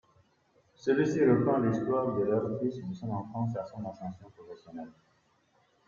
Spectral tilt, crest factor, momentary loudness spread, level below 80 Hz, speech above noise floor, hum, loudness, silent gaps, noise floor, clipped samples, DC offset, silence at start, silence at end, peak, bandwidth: -8.5 dB/octave; 18 dB; 21 LU; -68 dBFS; 39 dB; none; -30 LUFS; none; -69 dBFS; under 0.1%; under 0.1%; 0.85 s; 0.95 s; -14 dBFS; 7.4 kHz